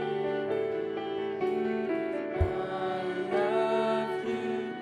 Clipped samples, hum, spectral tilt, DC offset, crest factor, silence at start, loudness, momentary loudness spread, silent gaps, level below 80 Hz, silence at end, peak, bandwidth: under 0.1%; none; -7 dB/octave; under 0.1%; 16 dB; 0 s; -31 LUFS; 6 LU; none; -46 dBFS; 0 s; -14 dBFS; 10 kHz